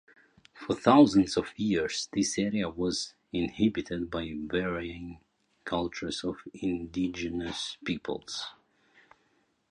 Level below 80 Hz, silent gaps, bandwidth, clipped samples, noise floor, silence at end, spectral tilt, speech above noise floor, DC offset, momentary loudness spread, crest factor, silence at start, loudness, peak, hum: -56 dBFS; none; 10.5 kHz; under 0.1%; -71 dBFS; 1.2 s; -4.5 dB/octave; 42 dB; under 0.1%; 15 LU; 24 dB; 0.55 s; -30 LUFS; -6 dBFS; none